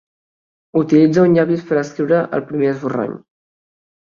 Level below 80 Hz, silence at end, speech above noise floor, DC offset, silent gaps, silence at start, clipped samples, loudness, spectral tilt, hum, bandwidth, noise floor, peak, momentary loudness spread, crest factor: -58 dBFS; 0.95 s; over 75 dB; under 0.1%; none; 0.75 s; under 0.1%; -16 LUFS; -8 dB/octave; none; 7.2 kHz; under -90 dBFS; -2 dBFS; 10 LU; 16 dB